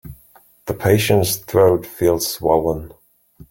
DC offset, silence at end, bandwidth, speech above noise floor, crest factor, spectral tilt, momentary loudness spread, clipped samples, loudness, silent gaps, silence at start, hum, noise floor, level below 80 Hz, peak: under 0.1%; 0.05 s; 17 kHz; 34 dB; 18 dB; -5 dB/octave; 12 LU; under 0.1%; -17 LUFS; none; 0.05 s; none; -51 dBFS; -44 dBFS; -2 dBFS